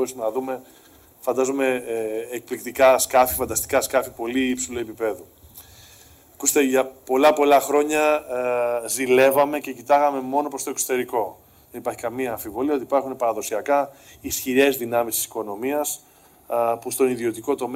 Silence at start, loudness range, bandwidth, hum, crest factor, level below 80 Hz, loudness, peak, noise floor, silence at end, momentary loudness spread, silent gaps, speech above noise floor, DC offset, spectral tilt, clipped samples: 0 s; 6 LU; 16 kHz; none; 16 dB; -56 dBFS; -22 LUFS; -6 dBFS; -50 dBFS; 0 s; 12 LU; none; 28 dB; under 0.1%; -3 dB/octave; under 0.1%